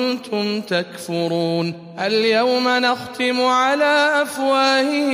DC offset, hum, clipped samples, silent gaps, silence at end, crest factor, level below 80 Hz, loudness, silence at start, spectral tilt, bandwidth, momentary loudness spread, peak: under 0.1%; none; under 0.1%; none; 0 s; 16 dB; -70 dBFS; -18 LUFS; 0 s; -4 dB/octave; 15.5 kHz; 8 LU; -4 dBFS